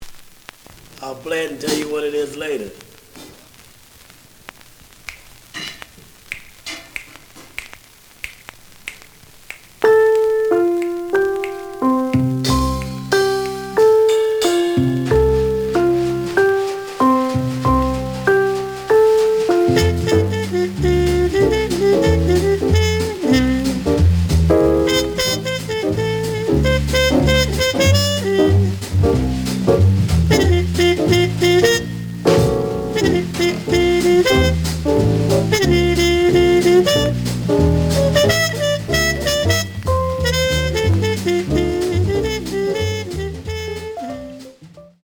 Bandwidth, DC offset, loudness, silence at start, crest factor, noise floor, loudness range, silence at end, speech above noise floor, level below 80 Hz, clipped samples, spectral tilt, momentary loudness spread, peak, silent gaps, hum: over 20 kHz; under 0.1%; -16 LUFS; 0 s; 16 dB; -45 dBFS; 17 LU; 0.2 s; 22 dB; -32 dBFS; under 0.1%; -5.5 dB/octave; 15 LU; -2 dBFS; none; none